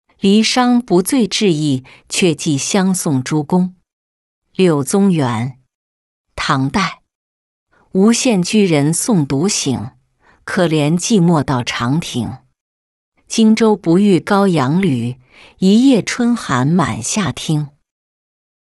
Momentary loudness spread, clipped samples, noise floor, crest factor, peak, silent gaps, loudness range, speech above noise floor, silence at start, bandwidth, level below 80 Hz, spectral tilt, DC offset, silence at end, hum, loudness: 10 LU; under 0.1%; -54 dBFS; 14 dB; -2 dBFS; 3.93-4.42 s, 5.75-6.24 s, 7.15-7.66 s, 12.61-13.12 s; 4 LU; 40 dB; 0.25 s; 12 kHz; -50 dBFS; -5 dB/octave; under 0.1%; 1.1 s; none; -15 LUFS